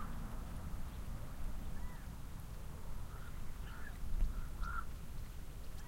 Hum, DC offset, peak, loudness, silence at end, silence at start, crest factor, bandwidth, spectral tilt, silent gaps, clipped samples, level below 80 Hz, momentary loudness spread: none; under 0.1%; -24 dBFS; -49 LUFS; 0 s; 0 s; 16 dB; 16 kHz; -5.5 dB/octave; none; under 0.1%; -44 dBFS; 7 LU